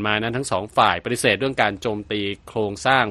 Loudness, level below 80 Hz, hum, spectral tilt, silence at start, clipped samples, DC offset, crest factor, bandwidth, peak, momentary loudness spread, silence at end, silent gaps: -21 LUFS; -50 dBFS; none; -4 dB/octave; 0 s; under 0.1%; under 0.1%; 20 dB; 13 kHz; -2 dBFS; 8 LU; 0 s; none